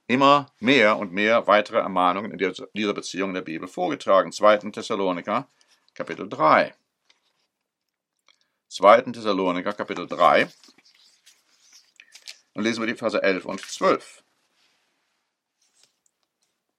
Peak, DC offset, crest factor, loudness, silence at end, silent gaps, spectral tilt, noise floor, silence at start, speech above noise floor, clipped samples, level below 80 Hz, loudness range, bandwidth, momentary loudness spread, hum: 0 dBFS; under 0.1%; 24 dB; -22 LUFS; 2.8 s; none; -4.5 dB/octave; -82 dBFS; 0.1 s; 61 dB; under 0.1%; -78 dBFS; 6 LU; 12 kHz; 14 LU; none